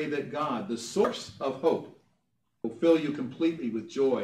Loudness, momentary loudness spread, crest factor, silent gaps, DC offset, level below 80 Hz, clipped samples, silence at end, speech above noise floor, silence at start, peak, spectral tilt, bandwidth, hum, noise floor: -29 LUFS; 9 LU; 18 dB; none; under 0.1%; -72 dBFS; under 0.1%; 0 s; 49 dB; 0 s; -12 dBFS; -5.5 dB/octave; 12.5 kHz; none; -77 dBFS